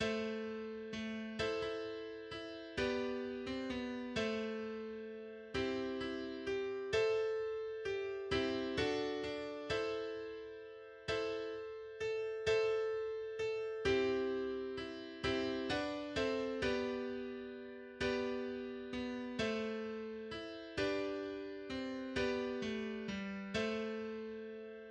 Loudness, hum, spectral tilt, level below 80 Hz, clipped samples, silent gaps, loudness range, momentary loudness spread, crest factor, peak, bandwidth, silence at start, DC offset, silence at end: -40 LUFS; none; -5 dB/octave; -62 dBFS; under 0.1%; none; 4 LU; 10 LU; 16 dB; -22 dBFS; 9.8 kHz; 0 s; under 0.1%; 0 s